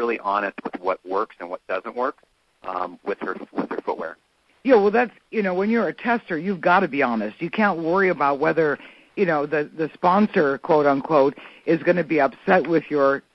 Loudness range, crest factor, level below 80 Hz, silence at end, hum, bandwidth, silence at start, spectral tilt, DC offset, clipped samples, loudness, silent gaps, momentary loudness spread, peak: 8 LU; 18 dB; -64 dBFS; 0.15 s; none; 6 kHz; 0 s; -8 dB/octave; under 0.1%; under 0.1%; -22 LUFS; none; 11 LU; -4 dBFS